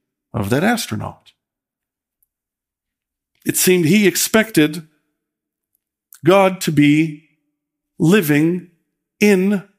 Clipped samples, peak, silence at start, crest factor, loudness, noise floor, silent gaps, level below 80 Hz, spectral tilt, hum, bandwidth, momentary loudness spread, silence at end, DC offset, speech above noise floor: under 0.1%; 0 dBFS; 0.35 s; 18 dB; -16 LUFS; -86 dBFS; none; -58 dBFS; -5 dB/octave; none; 16 kHz; 13 LU; 0.15 s; under 0.1%; 71 dB